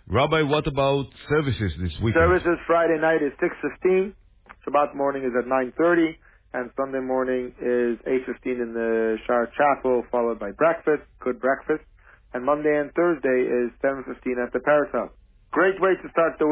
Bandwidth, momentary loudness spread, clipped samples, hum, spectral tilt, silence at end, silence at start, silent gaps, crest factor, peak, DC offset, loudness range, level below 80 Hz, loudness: 4 kHz; 8 LU; under 0.1%; none; -10.5 dB/octave; 0 s; 0.1 s; none; 16 dB; -8 dBFS; under 0.1%; 3 LU; -44 dBFS; -23 LUFS